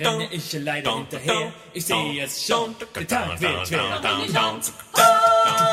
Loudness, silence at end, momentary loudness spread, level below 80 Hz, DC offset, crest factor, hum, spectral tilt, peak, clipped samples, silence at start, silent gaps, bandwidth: -21 LUFS; 0 s; 12 LU; -54 dBFS; under 0.1%; 18 dB; none; -3 dB/octave; -4 dBFS; under 0.1%; 0 s; none; 16 kHz